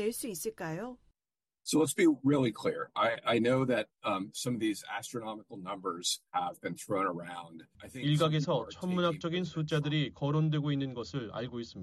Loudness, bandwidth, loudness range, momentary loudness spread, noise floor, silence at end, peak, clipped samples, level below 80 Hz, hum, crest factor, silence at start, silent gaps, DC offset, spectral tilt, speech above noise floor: -32 LUFS; 13 kHz; 5 LU; 13 LU; under -90 dBFS; 0 s; -16 dBFS; under 0.1%; -68 dBFS; none; 16 dB; 0 s; none; under 0.1%; -5 dB/octave; over 58 dB